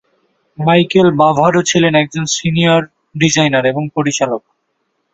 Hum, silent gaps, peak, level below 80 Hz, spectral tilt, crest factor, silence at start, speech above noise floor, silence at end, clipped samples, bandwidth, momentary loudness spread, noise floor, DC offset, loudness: none; none; 0 dBFS; -50 dBFS; -4.5 dB/octave; 14 dB; 0.6 s; 55 dB; 0.75 s; under 0.1%; 8 kHz; 7 LU; -67 dBFS; under 0.1%; -13 LUFS